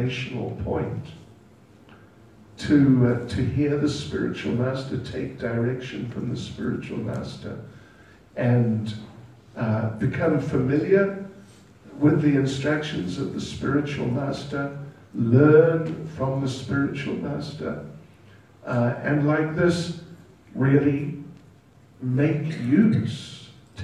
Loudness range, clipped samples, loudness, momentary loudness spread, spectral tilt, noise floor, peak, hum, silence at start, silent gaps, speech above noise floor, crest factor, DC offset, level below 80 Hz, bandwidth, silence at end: 6 LU; under 0.1%; -24 LUFS; 17 LU; -7.5 dB/octave; -53 dBFS; -4 dBFS; none; 0 s; none; 30 dB; 20 dB; under 0.1%; -50 dBFS; 10.5 kHz; 0 s